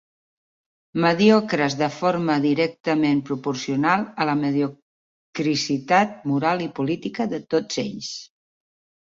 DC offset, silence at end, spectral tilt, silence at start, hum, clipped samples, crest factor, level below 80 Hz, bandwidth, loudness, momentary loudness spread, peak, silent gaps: under 0.1%; 0.75 s; -5.5 dB/octave; 0.95 s; none; under 0.1%; 18 dB; -64 dBFS; 7.8 kHz; -22 LUFS; 9 LU; -4 dBFS; 4.82-5.33 s